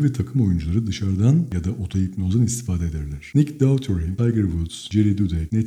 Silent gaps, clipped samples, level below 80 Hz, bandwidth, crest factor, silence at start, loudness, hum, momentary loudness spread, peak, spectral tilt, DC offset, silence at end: none; under 0.1%; -36 dBFS; 13.5 kHz; 16 dB; 0 s; -22 LUFS; none; 7 LU; -4 dBFS; -7 dB/octave; under 0.1%; 0 s